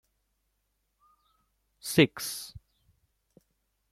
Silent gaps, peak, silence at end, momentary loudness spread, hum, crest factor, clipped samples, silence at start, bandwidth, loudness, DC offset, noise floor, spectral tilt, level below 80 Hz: none; -8 dBFS; 1.35 s; 18 LU; none; 26 dB; under 0.1%; 1.85 s; 16 kHz; -27 LUFS; under 0.1%; -78 dBFS; -4.5 dB/octave; -66 dBFS